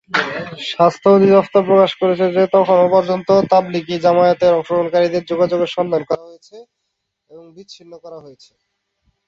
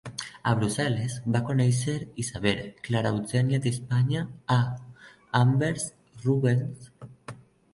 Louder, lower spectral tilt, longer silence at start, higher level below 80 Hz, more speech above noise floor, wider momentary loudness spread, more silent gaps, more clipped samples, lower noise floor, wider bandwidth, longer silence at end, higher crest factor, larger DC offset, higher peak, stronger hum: first, -15 LUFS vs -27 LUFS; about the same, -6.5 dB/octave vs -6 dB/octave; about the same, 0.15 s vs 0.05 s; about the same, -60 dBFS vs -56 dBFS; first, 59 dB vs 20 dB; about the same, 12 LU vs 14 LU; neither; neither; first, -74 dBFS vs -46 dBFS; second, 7.6 kHz vs 11.5 kHz; first, 1 s vs 0.4 s; second, 14 dB vs 20 dB; neither; first, -2 dBFS vs -8 dBFS; neither